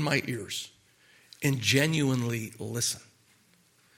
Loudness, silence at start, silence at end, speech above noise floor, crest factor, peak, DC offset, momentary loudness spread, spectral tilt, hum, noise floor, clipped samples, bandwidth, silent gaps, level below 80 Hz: -29 LUFS; 0 s; 0.95 s; 36 dB; 24 dB; -8 dBFS; under 0.1%; 12 LU; -4 dB/octave; none; -64 dBFS; under 0.1%; 17.5 kHz; none; -68 dBFS